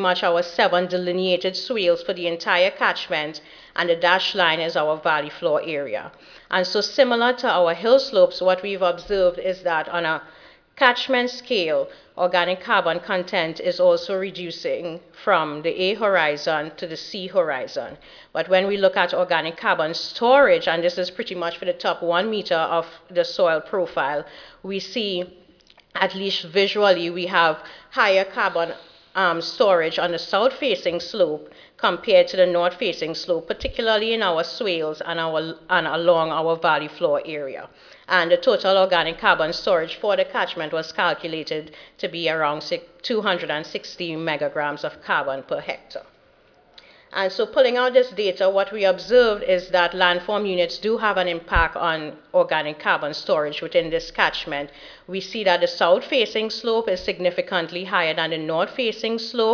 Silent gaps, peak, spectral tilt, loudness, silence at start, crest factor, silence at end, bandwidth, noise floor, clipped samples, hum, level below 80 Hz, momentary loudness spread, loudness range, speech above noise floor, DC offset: none; 0 dBFS; -4.5 dB/octave; -21 LUFS; 0 s; 22 dB; 0 s; 5.4 kHz; -56 dBFS; under 0.1%; none; -50 dBFS; 11 LU; 5 LU; 34 dB; under 0.1%